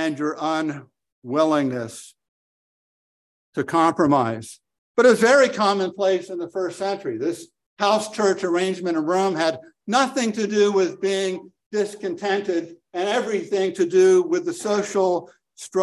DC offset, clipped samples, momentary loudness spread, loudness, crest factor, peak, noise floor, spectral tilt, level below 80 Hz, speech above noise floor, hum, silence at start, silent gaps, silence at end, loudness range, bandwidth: under 0.1%; under 0.1%; 13 LU; -21 LUFS; 18 dB; -4 dBFS; under -90 dBFS; -4.5 dB/octave; -68 dBFS; over 69 dB; none; 0 s; 1.12-1.22 s, 2.28-3.53 s, 4.78-4.95 s, 7.66-7.77 s, 11.66-11.71 s; 0 s; 5 LU; 12.5 kHz